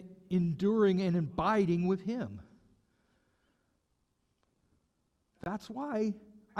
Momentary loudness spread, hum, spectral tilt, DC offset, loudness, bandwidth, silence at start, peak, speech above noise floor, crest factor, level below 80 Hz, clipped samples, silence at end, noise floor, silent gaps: 14 LU; none; -8.5 dB/octave; under 0.1%; -32 LUFS; 8 kHz; 0 s; -16 dBFS; 47 dB; 18 dB; -64 dBFS; under 0.1%; 0 s; -78 dBFS; none